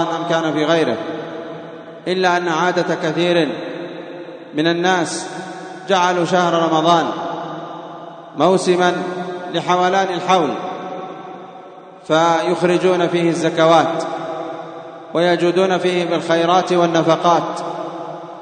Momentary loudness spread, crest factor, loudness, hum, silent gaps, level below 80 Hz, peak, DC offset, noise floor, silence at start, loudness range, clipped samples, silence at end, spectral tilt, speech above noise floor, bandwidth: 17 LU; 18 dB; -17 LUFS; none; none; -72 dBFS; 0 dBFS; under 0.1%; -38 dBFS; 0 s; 3 LU; under 0.1%; 0 s; -5 dB/octave; 22 dB; 9.6 kHz